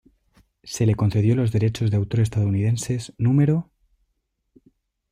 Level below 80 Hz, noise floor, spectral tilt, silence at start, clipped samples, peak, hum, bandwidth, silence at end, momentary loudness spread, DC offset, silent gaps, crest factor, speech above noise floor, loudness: -50 dBFS; -74 dBFS; -7 dB/octave; 0.65 s; under 0.1%; -10 dBFS; none; 12 kHz; 1.5 s; 6 LU; under 0.1%; none; 14 dB; 54 dB; -22 LUFS